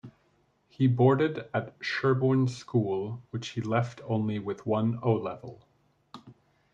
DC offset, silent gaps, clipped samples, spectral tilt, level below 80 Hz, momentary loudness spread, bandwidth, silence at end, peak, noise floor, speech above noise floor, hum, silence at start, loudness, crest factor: under 0.1%; none; under 0.1%; -7.5 dB/octave; -70 dBFS; 12 LU; 7.8 kHz; 0.4 s; -12 dBFS; -69 dBFS; 41 dB; none; 0.05 s; -28 LUFS; 18 dB